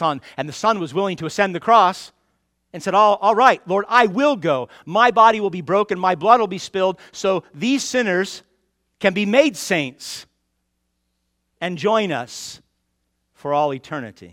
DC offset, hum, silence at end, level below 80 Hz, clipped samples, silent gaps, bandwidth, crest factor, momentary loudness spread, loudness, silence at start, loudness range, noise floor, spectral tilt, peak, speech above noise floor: under 0.1%; none; 0.05 s; -64 dBFS; under 0.1%; none; 16 kHz; 20 dB; 16 LU; -18 LUFS; 0 s; 9 LU; -72 dBFS; -4.5 dB/octave; 0 dBFS; 54 dB